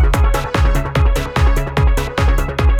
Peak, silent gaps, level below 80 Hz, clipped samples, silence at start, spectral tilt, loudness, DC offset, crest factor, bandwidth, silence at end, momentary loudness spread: -2 dBFS; none; -14 dBFS; under 0.1%; 0 s; -6 dB/octave; -16 LUFS; under 0.1%; 12 dB; 15.5 kHz; 0 s; 1 LU